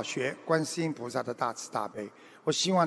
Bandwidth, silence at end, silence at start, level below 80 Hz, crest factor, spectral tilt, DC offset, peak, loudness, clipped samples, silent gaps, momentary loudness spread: 11 kHz; 0 s; 0 s; -78 dBFS; 20 dB; -4 dB/octave; under 0.1%; -10 dBFS; -32 LUFS; under 0.1%; none; 9 LU